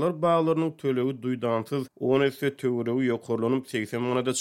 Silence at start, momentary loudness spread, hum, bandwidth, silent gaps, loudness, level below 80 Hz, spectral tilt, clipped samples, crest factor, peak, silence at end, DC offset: 0 s; 5 LU; none; 16 kHz; none; -27 LUFS; -72 dBFS; -6 dB/octave; under 0.1%; 16 dB; -10 dBFS; 0 s; under 0.1%